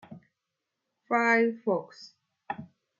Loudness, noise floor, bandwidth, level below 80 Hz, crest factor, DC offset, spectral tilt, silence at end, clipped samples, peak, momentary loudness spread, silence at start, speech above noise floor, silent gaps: -26 LUFS; -85 dBFS; 7.4 kHz; -82 dBFS; 20 dB; under 0.1%; -5.5 dB/octave; 0.35 s; under 0.1%; -12 dBFS; 17 LU; 0.1 s; 58 dB; none